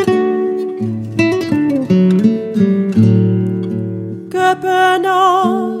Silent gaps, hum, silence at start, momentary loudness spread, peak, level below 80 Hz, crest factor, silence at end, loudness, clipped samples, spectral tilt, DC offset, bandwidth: none; none; 0 s; 9 LU; 0 dBFS; -56 dBFS; 14 dB; 0 s; -14 LUFS; under 0.1%; -7.5 dB/octave; under 0.1%; 14.5 kHz